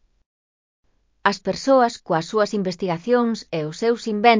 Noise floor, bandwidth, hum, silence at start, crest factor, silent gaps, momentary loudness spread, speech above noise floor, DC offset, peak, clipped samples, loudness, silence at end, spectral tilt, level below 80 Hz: under -90 dBFS; 7.6 kHz; none; 1.25 s; 20 dB; none; 7 LU; over 70 dB; under 0.1%; -2 dBFS; under 0.1%; -21 LUFS; 0 s; -5 dB/octave; -60 dBFS